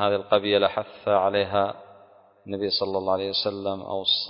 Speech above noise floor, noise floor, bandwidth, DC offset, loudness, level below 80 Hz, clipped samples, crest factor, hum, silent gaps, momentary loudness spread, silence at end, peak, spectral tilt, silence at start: 29 dB; -54 dBFS; 5.4 kHz; under 0.1%; -24 LUFS; -58 dBFS; under 0.1%; 20 dB; none; none; 8 LU; 0 s; -6 dBFS; -8.5 dB/octave; 0 s